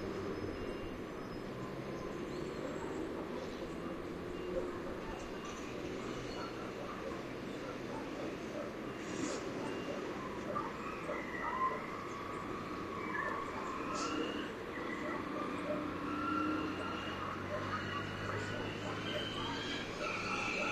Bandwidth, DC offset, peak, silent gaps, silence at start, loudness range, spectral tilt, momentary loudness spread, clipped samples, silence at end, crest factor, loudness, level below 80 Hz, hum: 14.5 kHz; under 0.1%; -24 dBFS; none; 0 s; 4 LU; -5 dB/octave; 6 LU; under 0.1%; 0 s; 16 dB; -41 LUFS; -60 dBFS; none